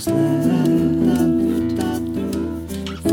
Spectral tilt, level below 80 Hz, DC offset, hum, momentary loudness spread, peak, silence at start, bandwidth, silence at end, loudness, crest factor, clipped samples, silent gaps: -7 dB/octave; -40 dBFS; under 0.1%; none; 8 LU; -6 dBFS; 0 s; 17.5 kHz; 0 s; -19 LUFS; 14 dB; under 0.1%; none